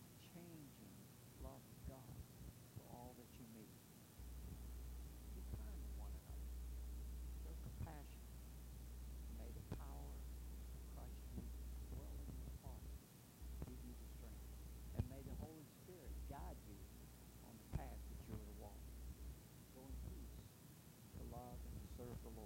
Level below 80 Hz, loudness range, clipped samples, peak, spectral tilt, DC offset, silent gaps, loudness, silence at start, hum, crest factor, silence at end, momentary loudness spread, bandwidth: -56 dBFS; 4 LU; under 0.1%; -30 dBFS; -6 dB/octave; under 0.1%; none; -56 LUFS; 0 s; none; 24 dB; 0 s; 7 LU; 16 kHz